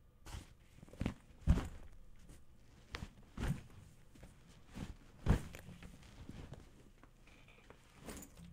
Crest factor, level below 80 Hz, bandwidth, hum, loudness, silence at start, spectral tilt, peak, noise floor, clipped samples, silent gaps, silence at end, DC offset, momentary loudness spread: 28 dB; -48 dBFS; 16 kHz; none; -44 LUFS; 0.05 s; -6.5 dB/octave; -18 dBFS; -62 dBFS; under 0.1%; none; 0 s; under 0.1%; 25 LU